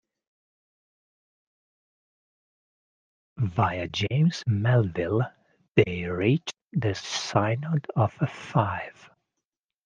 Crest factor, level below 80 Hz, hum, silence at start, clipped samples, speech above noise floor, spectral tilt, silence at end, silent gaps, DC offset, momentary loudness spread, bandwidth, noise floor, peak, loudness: 24 dB; -60 dBFS; none; 3.35 s; under 0.1%; 60 dB; -6.5 dB/octave; 0.95 s; none; under 0.1%; 7 LU; 9.2 kHz; -86 dBFS; -4 dBFS; -26 LUFS